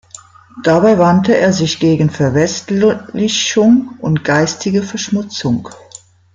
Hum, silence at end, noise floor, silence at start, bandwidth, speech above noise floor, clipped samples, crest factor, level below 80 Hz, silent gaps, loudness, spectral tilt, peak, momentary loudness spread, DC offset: none; 0.6 s; -40 dBFS; 0.55 s; 9.2 kHz; 27 dB; under 0.1%; 12 dB; -50 dBFS; none; -13 LUFS; -5 dB/octave; 0 dBFS; 8 LU; under 0.1%